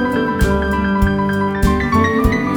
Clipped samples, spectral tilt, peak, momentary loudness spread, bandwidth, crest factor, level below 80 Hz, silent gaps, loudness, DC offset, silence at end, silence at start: under 0.1%; -7 dB/octave; 0 dBFS; 2 LU; over 20 kHz; 14 dB; -24 dBFS; none; -16 LUFS; under 0.1%; 0 s; 0 s